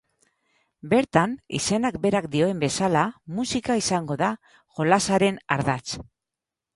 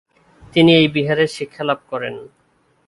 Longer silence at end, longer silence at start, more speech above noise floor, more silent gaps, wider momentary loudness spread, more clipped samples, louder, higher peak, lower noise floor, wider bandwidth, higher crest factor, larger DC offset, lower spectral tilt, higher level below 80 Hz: about the same, 0.7 s vs 0.65 s; first, 0.85 s vs 0.55 s; first, 64 dB vs 44 dB; neither; second, 9 LU vs 15 LU; neither; second, -24 LUFS vs -17 LUFS; second, -4 dBFS vs 0 dBFS; first, -88 dBFS vs -60 dBFS; about the same, 11.5 kHz vs 11.5 kHz; about the same, 20 dB vs 18 dB; neither; second, -4.5 dB/octave vs -6 dB/octave; about the same, -54 dBFS vs -54 dBFS